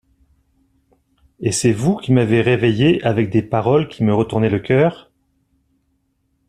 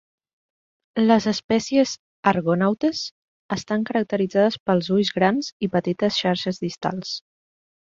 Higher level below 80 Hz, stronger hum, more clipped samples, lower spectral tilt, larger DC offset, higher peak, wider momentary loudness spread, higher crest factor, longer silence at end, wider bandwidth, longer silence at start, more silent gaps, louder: first, -50 dBFS vs -60 dBFS; neither; neither; about the same, -6 dB/octave vs -5.5 dB/octave; neither; about the same, -2 dBFS vs -2 dBFS; second, 4 LU vs 11 LU; about the same, 18 dB vs 20 dB; first, 1.55 s vs 0.75 s; first, 13 kHz vs 7.6 kHz; first, 1.4 s vs 0.95 s; second, none vs 1.44-1.49 s, 1.99-2.23 s, 3.11-3.49 s, 4.60-4.66 s, 5.52-5.60 s; first, -17 LUFS vs -22 LUFS